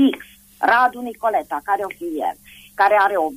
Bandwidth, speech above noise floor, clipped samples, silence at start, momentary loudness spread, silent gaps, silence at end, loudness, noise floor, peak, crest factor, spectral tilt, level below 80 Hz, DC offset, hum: 15.5 kHz; 19 dB; under 0.1%; 0 s; 13 LU; none; 0 s; -19 LUFS; -38 dBFS; -4 dBFS; 14 dB; -4 dB/octave; -60 dBFS; under 0.1%; none